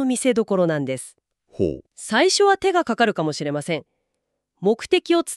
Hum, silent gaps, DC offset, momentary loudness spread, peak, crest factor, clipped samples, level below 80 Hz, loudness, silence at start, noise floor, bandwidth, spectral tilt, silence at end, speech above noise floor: none; none; under 0.1%; 12 LU; -4 dBFS; 18 dB; under 0.1%; -56 dBFS; -21 LUFS; 0 s; -77 dBFS; 13 kHz; -4 dB/octave; 0 s; 57 dB